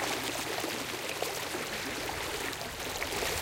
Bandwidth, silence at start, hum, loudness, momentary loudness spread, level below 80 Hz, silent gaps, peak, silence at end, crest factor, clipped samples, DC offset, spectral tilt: 17 kHz; 0 s; none; -34 LUFS; 3 LU; -54 dBFS; none; -16 dBFS; 0 s; 18 dB; under 0.1%; under 0.1%; -2 dB/octave